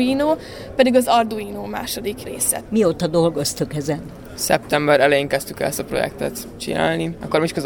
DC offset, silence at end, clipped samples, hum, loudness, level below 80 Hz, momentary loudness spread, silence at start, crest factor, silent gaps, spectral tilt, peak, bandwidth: under 0.1%; 0 s; under 0.1%; none; -20 LUFS; -46 dBFS; 12 LU; 0 s; 18 dB; none; -4 dB/octave; -2 dBFS; 19.5 kHz